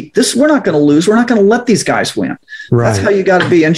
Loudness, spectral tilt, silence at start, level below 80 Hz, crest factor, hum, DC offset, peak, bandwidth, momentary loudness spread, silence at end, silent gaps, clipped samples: -11 LUFS; -5 dB/octave; 0 s; -48 dBFS; 10 dB; none; under 0.1%; 0 dBFS; 15.5 kHz; 7 LU; 0 s; none; under 0.1%